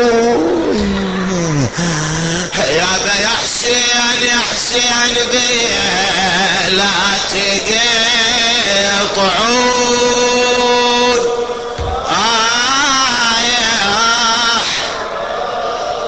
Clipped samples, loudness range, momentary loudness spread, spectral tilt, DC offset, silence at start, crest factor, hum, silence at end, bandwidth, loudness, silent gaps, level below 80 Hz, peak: under 0.1%; 2 LU; 6 LU; -2 dB/octave; 0.4%; 0 s; 12 dB; none; 0 s; 9 kHz; -12 LUFS; none; -38 dBFS; -2 dBFS